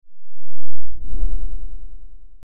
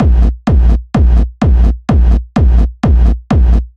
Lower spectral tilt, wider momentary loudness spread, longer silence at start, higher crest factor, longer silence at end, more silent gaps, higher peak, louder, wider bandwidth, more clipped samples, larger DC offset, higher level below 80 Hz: first, -11.5 dB/octave vs -9 dB/octave; first, 20 LU vs 1 LU; about the same, 0 s vs 0 s; about the same, 6 dB vs 8 dB; about the same, 0 s vs 0.1 s; neither; about the same, -2 dBFS vs 0 dBFS; second, -34 LUFS vs -12 LUFS; second, 1.4 kHz vs 5.4 kHz; neither; neither; second, -28 dBFS vs -10 dBFS